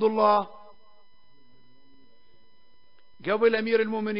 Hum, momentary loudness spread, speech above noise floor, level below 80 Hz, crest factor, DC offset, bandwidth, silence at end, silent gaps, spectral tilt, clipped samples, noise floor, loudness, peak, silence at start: none; 13 LU; 42 dB; -72 dBFS; 20 dB; 0.5%; 5.4 kHz; 0 s; none; -9.5 dB/octave; under 0.1%; -65 dBFS; -24 LUFS; -8 dBFS; 0 s